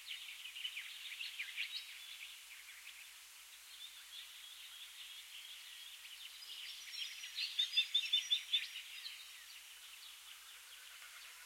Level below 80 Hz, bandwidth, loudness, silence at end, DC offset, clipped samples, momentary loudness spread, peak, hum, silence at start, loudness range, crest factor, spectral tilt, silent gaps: -88 dBFS; 16.5 kHz; -42 LUFS; 0 s; under 0.1%; under 0.1%; 19 LU; -22 dBFS; none; 0 s; 13 LU; 24 dB; 5.5 dB/octave; none